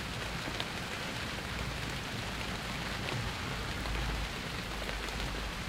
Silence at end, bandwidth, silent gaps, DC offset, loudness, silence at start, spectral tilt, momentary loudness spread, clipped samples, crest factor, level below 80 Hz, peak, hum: 0 s; 16 kHz; none; under 0.1%; -37 LUFS; 0 s; -4 dB/octave; 2 LU; under 0.1%; 22 dB; -44 dBFS; -16 dBFS; none